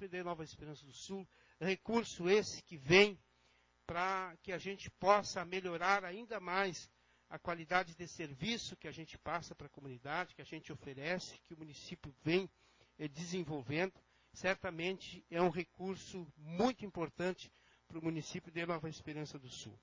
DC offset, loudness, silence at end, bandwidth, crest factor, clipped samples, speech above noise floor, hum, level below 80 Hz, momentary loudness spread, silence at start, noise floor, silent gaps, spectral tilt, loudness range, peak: under 0.1%; -39 LUFS; 0.05 s; 7.6 kHz; 28 dB; under 0.1%; 33 dB; none; -68 dBFS; 17 LU; 0 s; -73 dBFS; none; -4.5 dB/octave; 8 LU; -12 dBFS